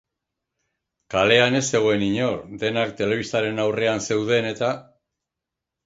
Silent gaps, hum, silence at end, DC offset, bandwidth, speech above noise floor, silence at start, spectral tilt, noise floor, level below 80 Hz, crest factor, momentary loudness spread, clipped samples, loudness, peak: none; none; 1.05 s; under 0.1%; 8 kHz; 64 dB; 1.1 s; -4 dB/octave; -85 dBFS; -56 dBFS; 22 dB; 9 LU; under 0.1%; -21 LUFS; -2 dBFS